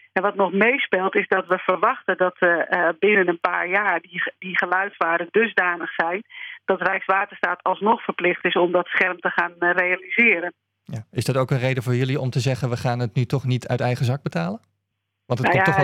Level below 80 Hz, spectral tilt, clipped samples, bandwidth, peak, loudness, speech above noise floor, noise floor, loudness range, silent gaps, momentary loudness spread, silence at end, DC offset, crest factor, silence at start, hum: -64 dBFS; -6.5 dB/octave; under 0.1%; 13.5 kHz; -2 dBFS; -21 LUFS; 56 dB; -77 dBFS; 4 LU; none; 8 LU; 0 s; under 0.1%; 20 dB; 0.15 s; none